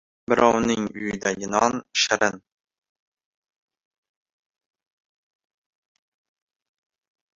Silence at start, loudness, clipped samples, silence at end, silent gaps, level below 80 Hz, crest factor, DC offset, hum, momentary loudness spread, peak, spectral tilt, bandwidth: 0.3 s; -22 LUFS; under 0.1%; 5 s; none; -60 dBFS; 24 dB; under 0.1%; none; 8 LU; -2 dBFS; -3 dB/octave; 7.8 kHz